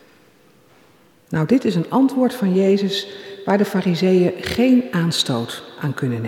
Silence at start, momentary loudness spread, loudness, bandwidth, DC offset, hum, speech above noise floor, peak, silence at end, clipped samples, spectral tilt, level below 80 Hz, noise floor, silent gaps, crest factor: 1.3 s; 11 LU; -19 LUFS; 16.5 kHz; under 0.1%; none; 35 dB; -4 dBFS; 0 s; under 0.1%; -6 dB/octave; -54 dBFS; -53 dBFS; none; 16 dB